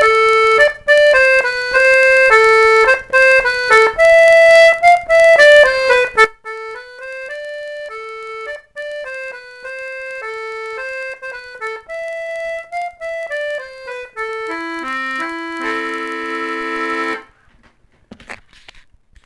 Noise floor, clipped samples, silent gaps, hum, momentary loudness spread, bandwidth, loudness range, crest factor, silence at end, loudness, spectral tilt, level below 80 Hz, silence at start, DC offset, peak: -53 dBFS; under 0.1%; none; none; 21 LU; 12 kHz; 18 LU; 14 dB; 0.9 s; -11 LUFS; -1.5 dB/octave; -48 dBFS; 0 s; under 0.1%; 0 dBFS